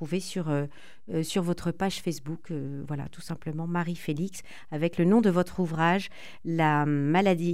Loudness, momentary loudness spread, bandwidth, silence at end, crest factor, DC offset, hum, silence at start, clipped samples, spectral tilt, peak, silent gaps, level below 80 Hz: -28 LUFS; 14 LU; 15 kHz; 0 s; 18 dB; 0.9%; none; 0 s; under 0.1%; -6.5 dB/octave; -10 dBFS; none; -58 dBFS